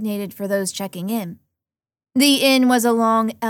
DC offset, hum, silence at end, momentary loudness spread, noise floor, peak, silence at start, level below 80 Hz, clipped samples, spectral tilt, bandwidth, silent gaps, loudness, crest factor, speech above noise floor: under 0.1%; none; 0 s; 12 LU; -89 dBFS; -4 dBFS; 0 s; -70 dBFS; under 0.1%; -3.5 dB/octave; 19 kHz; none; -18 LUFS; 16 dB; 71 dB